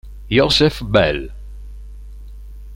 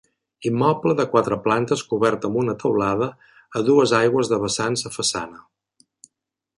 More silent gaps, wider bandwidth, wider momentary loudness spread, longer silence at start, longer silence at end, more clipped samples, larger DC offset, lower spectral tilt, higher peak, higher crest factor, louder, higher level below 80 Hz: neither; first, 16.5 kHz vs 11.5 kHz; first, 25 LU vs 8 LU; second, 0.05 s vs 0.4 s; second, 0 s vs 1.2 s; neither; neither; about the same, -5 dB/octave vs -5 dB/octave; about the same, -2 dBFS vs -4 dBFS; about the same, 18 dB vs 18 dB; first, -16 LUFS vs -21 LUFS; first, -32 dBFS vs -58 dBFS